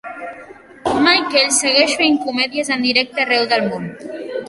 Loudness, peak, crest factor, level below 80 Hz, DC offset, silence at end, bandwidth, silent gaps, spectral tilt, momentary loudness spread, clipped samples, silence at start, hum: -15 LUFS; 0 dBFS; 18 dB; -56 dBFS; under 0.1%; 0 s; 11.5 kHz; none; -2 dB/octave; 16 LU; under 0.1%; 0.05 s; none